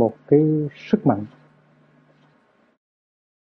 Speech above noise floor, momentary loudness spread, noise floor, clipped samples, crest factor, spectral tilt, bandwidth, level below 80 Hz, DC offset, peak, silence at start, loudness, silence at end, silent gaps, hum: 40 dB; 9 LU; -60 dBFS; under 0.1%; 20 dB; -10.5 dB/octave; 6.2 kHz; -64 dBFS; under 0.1%; -2 dBFS; 0 s; -20 LUFS; 2.25 s; none; none